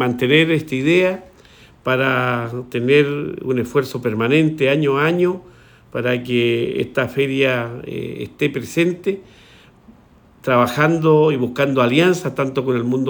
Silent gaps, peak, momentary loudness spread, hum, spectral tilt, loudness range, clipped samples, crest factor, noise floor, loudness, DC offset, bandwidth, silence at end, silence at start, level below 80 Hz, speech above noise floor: none; -2 dBFS; 11 LU; none; -6.5 dB/octave; 4 LU; under 0.1%; 18 dB; -49 dBFS; -18 LUFS; under 0.1%; over 20 kHz; 0 s; 0 s; -56 dBFS; 32 dB